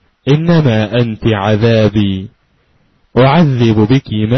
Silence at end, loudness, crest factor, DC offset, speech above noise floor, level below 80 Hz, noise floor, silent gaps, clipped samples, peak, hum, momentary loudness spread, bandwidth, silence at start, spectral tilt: 0 s; -11 LUFS; 12 dB; under 0.1%; 44 dB; -38 dBFS; -55 dBFS; none; under 0.1%; 0 dBFS; none; 7 LU; 6.2 kHz; 0.25 s; -8 dB/octave